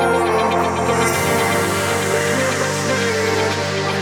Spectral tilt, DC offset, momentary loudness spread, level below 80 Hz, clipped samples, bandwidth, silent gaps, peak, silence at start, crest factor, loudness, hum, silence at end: -4 dB/octave; under 0.1%; 2 LU; -48 dBFS; under 0.1%; over 20 kHz; none; -4 dBFS; 0 s; 14 dB; -17 LUFS; none; 0 s